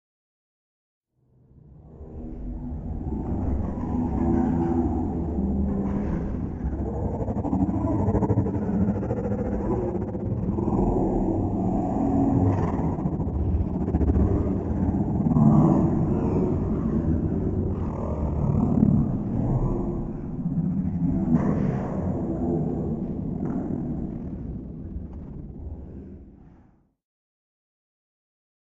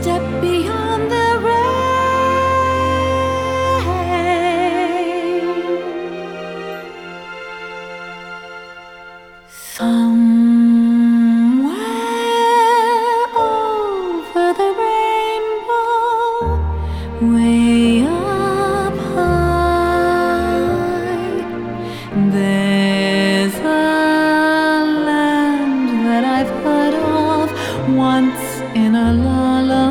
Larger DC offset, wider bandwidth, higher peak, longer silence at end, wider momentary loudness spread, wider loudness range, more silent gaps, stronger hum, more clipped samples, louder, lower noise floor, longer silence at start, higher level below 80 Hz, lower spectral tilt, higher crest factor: neither; second, 7.6 kHz vs 16.5 kHz; about the same, -4 dBFS vs -4 dBFS; first, 2.25 s vs 0 s; about the same, 13 LU vs 14 LU; first, 12 LU vs 7 LU; neither; neither; neither; second, -25 LUFS vs -16 LUFS; first, -61 dBFS vs -39 dBFS; first, 1.65 s vs 0 s; about the same, -34 dBFS vs -34 dBFS; first, -12 dB/octave vs -6 dB/octave; first, 20 dB vs 12 dB